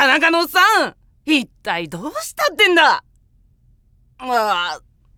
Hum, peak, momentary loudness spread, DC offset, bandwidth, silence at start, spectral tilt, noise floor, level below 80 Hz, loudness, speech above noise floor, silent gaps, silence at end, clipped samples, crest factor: none; 0 dBFS; 14 LU; under 0.1%; 19.5 kHz; 0 s; -2 dB/octave; -55 dBFS; -56 dBFS; -16 LUFS; 38 dB; none; 0.4 s; under 0.1%; 18 dB